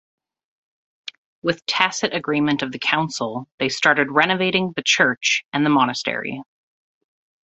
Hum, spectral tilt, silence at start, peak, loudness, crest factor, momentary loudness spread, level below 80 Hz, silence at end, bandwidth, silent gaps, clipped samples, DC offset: none; -3.5 dB/octave; 1.05 s; -2 dBFS; -20 LUFS; 22 dB; 13 LU; -64 dBFS; 1.05 s; 8.2 kHz; 1.18-1.42 s, 3.52-3.58 s, 5.45-5.52 s; under 0.1%; under 0.1%